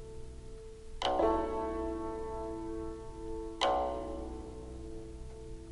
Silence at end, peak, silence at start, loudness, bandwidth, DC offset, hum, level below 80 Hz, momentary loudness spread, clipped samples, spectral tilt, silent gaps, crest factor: 0 s; -14 dBFS; 0 s; -36 LUFS; 11.5 kHz; under 0.1%; none; -46 dBFS; 18 LU; under 0.1%; -5.5 dB/octave; none; 22 dB